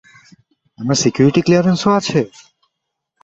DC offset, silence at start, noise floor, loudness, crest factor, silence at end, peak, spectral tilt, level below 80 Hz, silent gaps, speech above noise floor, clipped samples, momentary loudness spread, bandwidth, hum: under 0.1%; 0.8 s; -77 dBFS; -15 LUFS; 16 dB; 0.95 s; 0 dBFS; -5.5 dB/octave; -52 dBFS; none; 63 dB; under 0.1%; 9 LU; 8.2 kHz; none